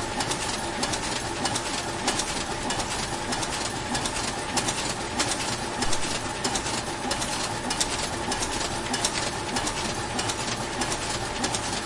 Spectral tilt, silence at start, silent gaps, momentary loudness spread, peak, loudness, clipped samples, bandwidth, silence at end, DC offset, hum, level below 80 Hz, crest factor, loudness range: -2.5 dB/octave; 0 s; none; 3 LU; -8 dBFS; -27 LUFS; under 0.1%; 11.5 kHz; 0 s; under 0.1%; none; -44 dBFS; 20 dB; 1 LU